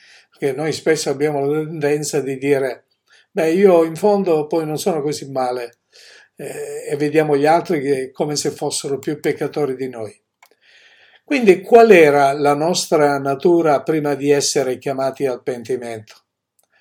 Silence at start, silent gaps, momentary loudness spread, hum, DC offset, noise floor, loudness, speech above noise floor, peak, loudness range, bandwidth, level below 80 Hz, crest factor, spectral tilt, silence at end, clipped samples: 0.4 s; none; 13 LU; none; under 0.1%; -66 dBFS; -17 LUFS; 50 dB; 0 dBFS; 8 LU; 17.5 kHz; -66 dBFS; 18 dB; -4.5 dB/octave; 0.7 s; under 0.1%